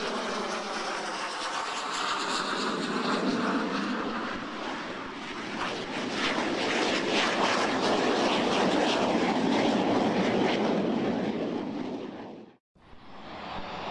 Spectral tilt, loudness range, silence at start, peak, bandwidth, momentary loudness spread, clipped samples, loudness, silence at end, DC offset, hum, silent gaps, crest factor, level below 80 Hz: -4 dB/octave; 6 LU; 0 s; -14 dBFS; 11.5 kHz; 11 LU; under 0.1%; -28 LUFS; 0 s; under 0.1%; none; 12.60-12.75 s; 16 dB; -62 dBFS